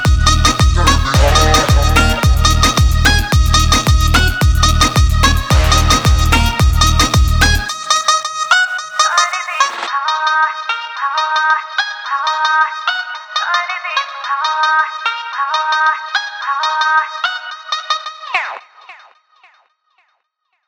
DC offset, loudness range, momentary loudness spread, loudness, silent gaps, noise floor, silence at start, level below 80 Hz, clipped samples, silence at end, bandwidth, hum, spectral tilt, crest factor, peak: under 0.1%; 6 LU; 8 LU; -13 LUFS; none; -68 dBFS; 0 s; -18 dBFS; under 0.1%; 1.7 s; over 20 kHz; none; -3.5 dB/octave; 14 dB; 0 dBFS